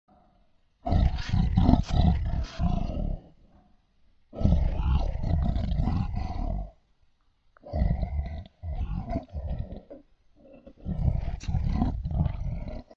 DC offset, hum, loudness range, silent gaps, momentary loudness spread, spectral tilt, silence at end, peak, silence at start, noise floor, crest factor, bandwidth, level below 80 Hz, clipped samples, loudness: under 0.1%; none; 7 LU; none; 13 LU; -8.5 dB/octave; 0.15 s; -4 dBFS; 0.85 s; -65 dBFS; 24 dB; 7 kHz; -30 dBFS; under 0.1%; -29 LUFS